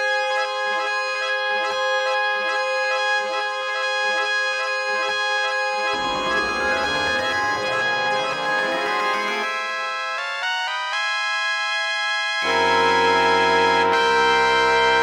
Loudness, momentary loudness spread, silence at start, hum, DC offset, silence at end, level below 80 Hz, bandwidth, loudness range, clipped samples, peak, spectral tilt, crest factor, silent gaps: -20 LUFS; 6 LU; 0 s; none; under 0.1%; 0 s; -54 dBFS; over 20 kHz; 4 LU; under 0.1%; -4 dBFS; -2 dB/octave; 16 dB; none